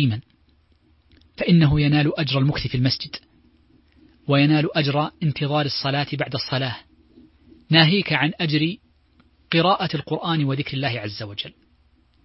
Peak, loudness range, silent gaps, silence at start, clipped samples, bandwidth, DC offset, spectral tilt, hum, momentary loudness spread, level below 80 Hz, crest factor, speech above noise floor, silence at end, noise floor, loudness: 0 dBFS; 3 LU; none; 0 s; under 0.1%; 6 kHz; under 0.1%; -9 dB/octave; none; 14 LU; -48 dBFS; 22 dB; 39 dB; 0.75 s; -59 dBFS; -21 LUFS